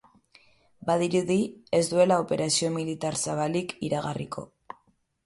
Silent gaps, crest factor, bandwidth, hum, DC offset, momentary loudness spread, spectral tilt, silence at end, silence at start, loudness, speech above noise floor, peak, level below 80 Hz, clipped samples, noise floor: none; 20 dB; 11.5 kHz; none; under 0.1%; 17 LU; -4.5 dB/octave; 0.8 s; 0.85 s; -27 LUFS; 41 dB; -8 dBFS; -64 dBFS; under 0.1%; -67 dBFS